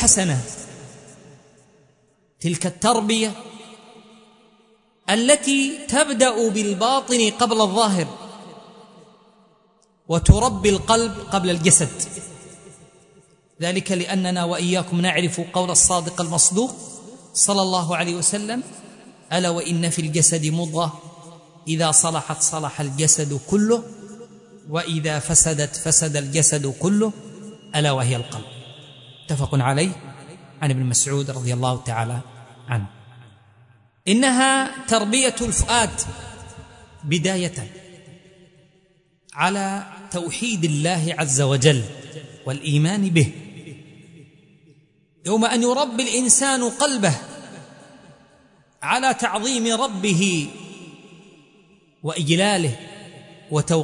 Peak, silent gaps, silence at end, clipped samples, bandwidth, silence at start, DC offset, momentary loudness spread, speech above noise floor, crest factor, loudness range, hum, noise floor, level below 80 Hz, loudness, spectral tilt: 0 dBFS; none; 0 s; under 0.1%; 11 kHz; 0 s; under 0.1%; 21 LU; 41 dB; 22 dB; 6 LU; none; -61 dBFS; -42 dBFS; -19 LUFS; -3.5 dB/octave